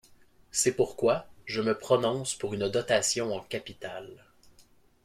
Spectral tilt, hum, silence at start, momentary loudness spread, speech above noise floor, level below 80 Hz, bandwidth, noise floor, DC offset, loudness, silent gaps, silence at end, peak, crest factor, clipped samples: -3.5 dB/octave; none; 0.55 s; 14 LU; 32 dB; -64 dBFS; 16 kHz; -61 dBFS; under 0.1%; -29 LUFS; none; 0.9 s; -10 dBFS; 20 dB; under 0.1%